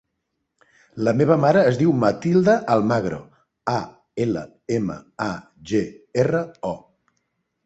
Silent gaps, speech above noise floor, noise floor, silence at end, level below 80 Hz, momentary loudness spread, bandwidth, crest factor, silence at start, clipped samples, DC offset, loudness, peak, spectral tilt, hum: none; 56 dB; -77 dBFS; 0.85 s; -56 dBFS; 14 LU; 8.2 kHz; 20 dB; 0.95 s; under 0.1%; under 0.1%; -21 LUFS; -2 dBFS; -7.5 dB/octave; none